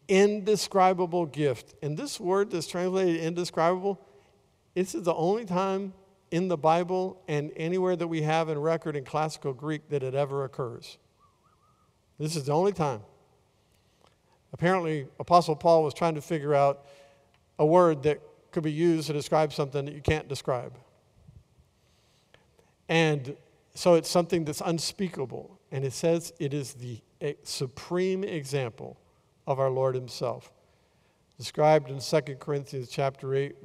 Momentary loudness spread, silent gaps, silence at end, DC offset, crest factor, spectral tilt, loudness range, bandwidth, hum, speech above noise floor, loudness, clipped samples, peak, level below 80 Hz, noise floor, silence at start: 13 LU; none; 0.1 s; under 0.1%; 22 dB; -5.5 dB/octave; 7 LU; 15.5 kHz; none; 39 dB; -28 LUFS; under 0.1%; -8 dBFS; -60 dBFS; -66 dBFS; 0.1 s